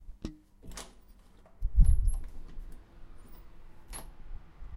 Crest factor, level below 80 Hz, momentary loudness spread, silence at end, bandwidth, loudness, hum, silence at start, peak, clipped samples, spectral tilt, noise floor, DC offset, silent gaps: 22 dB; -32 dBFS; 27 LU; 0 s; 12 kHz; -34 LUFS; none; 0 s; -10 dBFS; under 0.1%; -6 dB/octave; -56 dBFS; under 0.1%; none